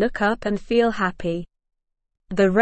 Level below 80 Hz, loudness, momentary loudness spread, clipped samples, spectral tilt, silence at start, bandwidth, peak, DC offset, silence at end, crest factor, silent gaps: -44 dBFS; -23 LUFS; 9 LU; under 0.1%; -6.5 dB/octave; 0 s; 8.6 kHz; -4 dBFS; under 0.1%; 0 s; 18 dB; none